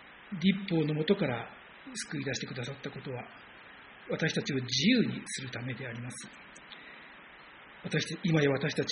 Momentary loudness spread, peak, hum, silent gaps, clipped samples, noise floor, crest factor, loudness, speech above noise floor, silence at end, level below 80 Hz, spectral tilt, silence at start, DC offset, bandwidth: 22 LU; -12 dBFS; none; none; under 0.1%; -52 dBFS; 20 dB; -32 LUFS; 21 dB; 0 s; -68 dBFS; -5 dB/octave; 0 s; under 0.1%; 10 kHz